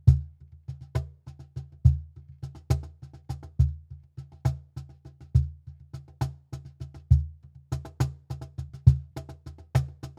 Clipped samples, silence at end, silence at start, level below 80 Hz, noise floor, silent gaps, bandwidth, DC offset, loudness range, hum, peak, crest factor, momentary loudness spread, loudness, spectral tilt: under 0.1%; 0.1 s; 0.05 s; -34 dBFS; -49 dBFS; none; 9.8 kHz; under 0.1%; 4 LU; none; -4 dBFS; 24 dB; 21 LU; -29 LUFS; -8 dB/octave